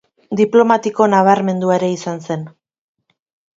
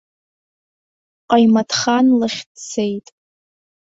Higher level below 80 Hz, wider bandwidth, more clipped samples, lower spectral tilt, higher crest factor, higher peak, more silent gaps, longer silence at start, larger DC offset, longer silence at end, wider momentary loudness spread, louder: about the same, -64 dBFS vs -62 dBFS; about the same, 7.8 kHz vs 7.8 kHz; neither; first, -6.5 dB/octave vs -4 dB/octave; about the same, 16 dB vs 16 dB; about the same, 0 dBFS vs -2 dBFS; second, none vs 2.46-2.55 s; second, 0.3 s vs 1.3 s; neither; first, 1.1 s vs 0.9 s; about the same, 13 LU vs 14 LU; about the same, -15 LUFS vs -16 LUFS